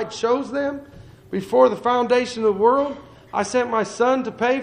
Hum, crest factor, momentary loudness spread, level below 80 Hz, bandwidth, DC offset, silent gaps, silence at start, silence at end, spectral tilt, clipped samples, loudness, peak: none; 18 dB; 11 LU; -56 dBFS; 10.5 kHz; under 0.1%; none; 0 s; 0 s; -4.5 dB/octave; under 0.1%; -21 LUFS; -2 dBFS